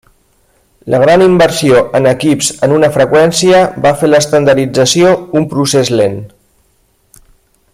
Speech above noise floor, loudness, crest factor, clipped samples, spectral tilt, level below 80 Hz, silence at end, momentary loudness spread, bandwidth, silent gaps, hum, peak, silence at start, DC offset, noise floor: 46 dB; -9 LUFS; 10 dB; under 0.1%; -4.5 dB/octave; -44 dBFS; 1.45 s; 6 LU; 15.5 kHz; none; none; 0 dBFS; 0.85 s; under 0.1%; -54 dBFS